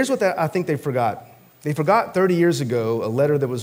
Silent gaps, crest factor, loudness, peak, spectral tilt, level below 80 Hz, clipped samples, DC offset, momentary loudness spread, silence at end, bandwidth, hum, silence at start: none; 16 dB; -21 LUFS; -4 dBFS; -6.5 dB/octave; -66 dBFS; under 0.1%; under 0.1%; 7 LU; 0 s; 16 kHz; none; 0 s